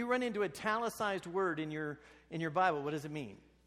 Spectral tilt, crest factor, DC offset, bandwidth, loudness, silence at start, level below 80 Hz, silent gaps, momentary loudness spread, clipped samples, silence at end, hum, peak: -5.5 dB/octave; 18 dB; under 0.1%; 15 kHz; -36 LUFS; 0 s; -70 dBFS; none; 12 LU; under 0.1%; 0.3 s; none; -18 dBFS